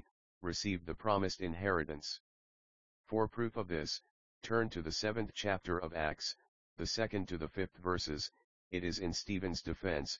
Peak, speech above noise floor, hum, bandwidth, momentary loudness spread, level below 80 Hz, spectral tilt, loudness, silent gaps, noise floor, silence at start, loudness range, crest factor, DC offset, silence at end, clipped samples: -18 dBFS; over 52 dB; none; 7.4 kHz; 7 LU; -56 dBFS; -3.5 dB/octave; -38 LUFS; 0.11-0.41 s, 2.20-3.04 s, 4.11-4.41 s, 6.48-6.76 s, 8.44-8.71 s; under -90 dBFS; 0 s; 2 LU; 22 dB; 0.2%; 0 s; under 0.1%